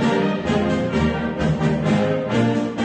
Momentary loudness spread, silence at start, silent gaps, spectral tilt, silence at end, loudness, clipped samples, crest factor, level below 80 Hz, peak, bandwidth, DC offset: 2 LU; 0 s; none; -7 dB/octave; 0 s; -20 LUFS; under 0.1%; 14 dB; -38 dBFS; -6 dBFS; 9.2 kHz; under 0.1%